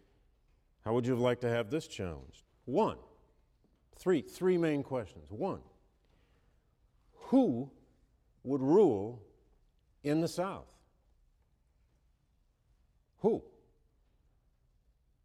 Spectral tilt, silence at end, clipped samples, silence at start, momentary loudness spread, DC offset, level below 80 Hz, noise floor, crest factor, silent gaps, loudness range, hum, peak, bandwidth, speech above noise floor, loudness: -7 dB/octave; 1.85 s; under 0.1%; 0.85 s; 18 LU; under 0.1%; -66 dBFS; -73 dBFS; 20 dB; none; 9 LU; none; -16 dBFS; 14.5 kHz; 41 dB; -33 LUFS